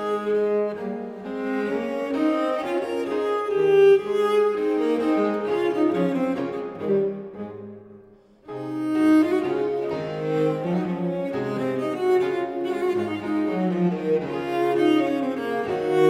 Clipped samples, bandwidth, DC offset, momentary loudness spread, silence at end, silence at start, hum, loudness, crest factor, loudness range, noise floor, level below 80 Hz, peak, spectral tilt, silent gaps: under 0.1%; 13 kHz; under 0.1%; 10 LU; 0 s; 0 s; none; -23 LUFS; 16 dB; 5 LU; -51 dBFS; -64 dBFS; -6 dBFS; -7.5 dB/octave; none